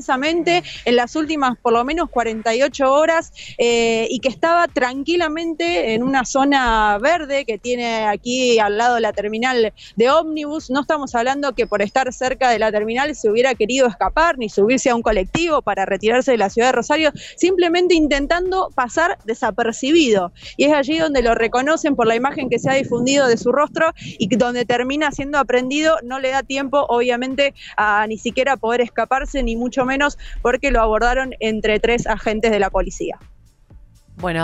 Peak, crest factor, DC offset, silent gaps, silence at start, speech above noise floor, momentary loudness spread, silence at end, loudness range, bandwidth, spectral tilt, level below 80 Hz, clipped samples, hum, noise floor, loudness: -4 dBFS; 14 dB; under 0.1%; none; 0 s; 28 dB; 5 LU; 0 s; 2 LU; 8.4 kHz; -4 dB/octave; -36 dBFS; under 0.1%; none; -46 dBFS; -18 LUFS